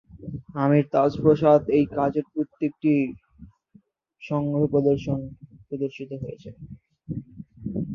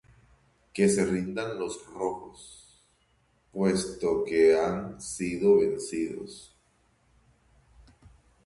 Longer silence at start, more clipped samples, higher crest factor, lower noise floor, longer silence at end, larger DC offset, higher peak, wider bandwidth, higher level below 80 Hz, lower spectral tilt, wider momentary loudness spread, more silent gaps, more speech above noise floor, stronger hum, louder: second, 0.15 s vs 0.75 s; neither; about the same, 20 dB vs 18 dB; second, -58 dBFS vs -68 dBFS; second, 0 s vs 2 s; neither; first, -4 dBFS vs -10 dBFS; second, 6.6 kHz vs 11.5 kHz; about the same, -54 dBFS vs -58 dBFS; first, -9.5 dB/octave vs -5.5 dB/octave; about the same, 20 LU vs 20 LU; neither; second, 36 dB vs 41 dB; neither; first, -23 LUFS vs -27 LUFS